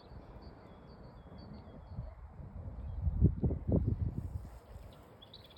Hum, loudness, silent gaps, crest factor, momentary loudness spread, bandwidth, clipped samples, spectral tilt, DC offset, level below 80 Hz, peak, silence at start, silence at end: none; -37 LUFS; none; 24 dB; 22 LU; 5.2 kHz; under 0.1%; -10 dB/octave; under 0.1%; -44 dBFS; -16 dBFS; 0 s; 0 s